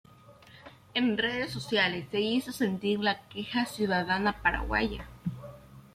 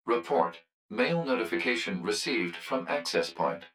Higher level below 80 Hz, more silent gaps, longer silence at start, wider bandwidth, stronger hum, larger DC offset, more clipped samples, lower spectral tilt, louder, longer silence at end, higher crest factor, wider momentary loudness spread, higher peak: first, -48 dBFS vs -76 dBFS; second, none vs 0.73-0.89 s; first, 0.3 s vs 0.05 s; about the same, 15.5 kHz vs 17 kHz; neither; neither; neither; about the same, -5 dB/octave vs -4 dB/octave; about the same, -30 LUFS vs -30 LUFS; about the same, 0.15 s vs 0.05 s; about the same, 20 dB vs 18 dB; first, 11 LU vs 4 LU; about the same, -12 dBFS vs -12 dBFS